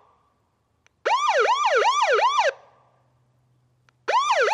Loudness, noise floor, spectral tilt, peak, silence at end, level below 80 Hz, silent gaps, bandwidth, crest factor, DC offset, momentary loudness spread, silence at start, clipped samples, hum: -21 LUFS; -69 dBFS; 0.5 dB/octave; -10 dBFS; 0 s; -80 dBFS; none; 11.5 kHz; 14 dB; under 0.1%; 6 LU; 1.05 s; under 0.1%; none